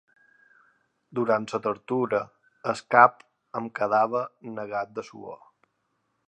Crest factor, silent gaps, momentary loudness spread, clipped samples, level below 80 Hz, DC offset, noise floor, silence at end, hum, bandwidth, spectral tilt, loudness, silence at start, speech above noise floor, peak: 26 dB; none; 21 LU; under 0.1%; -74 dBFS; under 0.1%; -75 dBFS; 0.95 s; none; 10 kHz; -6 dB/octave; -25 LUFS; 1.15 s; 50 dB; -2 dBFS